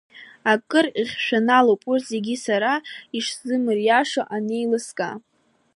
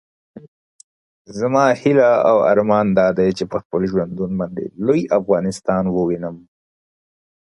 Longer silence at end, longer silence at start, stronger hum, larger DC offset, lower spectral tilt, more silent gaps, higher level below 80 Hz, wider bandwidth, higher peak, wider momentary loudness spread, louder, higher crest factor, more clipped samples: second, 0.55 s vs 1.1 s; second, 0.15 s vs 0.35 s; neither; neither; second, -4 dB/octave vs -7 dB/octave; second, none vs 0.48-1.25 s, 3.65-3.70 s; second, -74 dBFS vs -52 dBFS; about the same, 11.5 kHz vs 11.5 kHz; about the same, -4 dBFS vs -2 dBFS; about the same, 10 LU vs 10 LU; second, -22 LUFS vs -17 LUFS; about the same, 18 dB vs 18 dB; neither